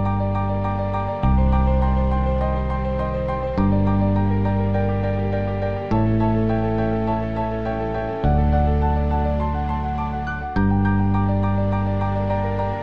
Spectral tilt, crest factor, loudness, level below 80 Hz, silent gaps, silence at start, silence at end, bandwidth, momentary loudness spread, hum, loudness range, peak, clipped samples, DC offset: -10 dB/octave; 14 dB; -21 LUFS; -26 dBFS; none; 0 s; 0 s; 5.2 kHz; 5 LU; none; 1 LU; -6 dBFS; under 0.1%; 2%